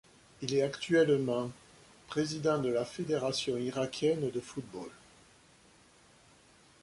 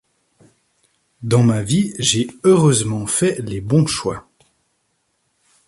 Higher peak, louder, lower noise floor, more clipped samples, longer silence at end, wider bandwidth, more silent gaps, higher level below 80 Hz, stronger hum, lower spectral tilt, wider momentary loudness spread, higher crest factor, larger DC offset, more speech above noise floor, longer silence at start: second, -16 dBFS vs -2 dBFS; second, -32 LUFS vs -17 LUFS; second, -62 dBFS vs -68 dBFS; neither; first, 1.9 s vs 1.5 s; about the same, 11.5 kHz vs 11.5 kHz; neither; second, -68 dBFS vs -50 dBFS; neither; about the same, -5 dB/octave vs -5 dB/octave; about the same, 14 LU vs 12 LU; about the same, 18 dB vs 16 dB; neither; second, 30 dB vs 51 dB; second, 0.4 s vs 1.2 s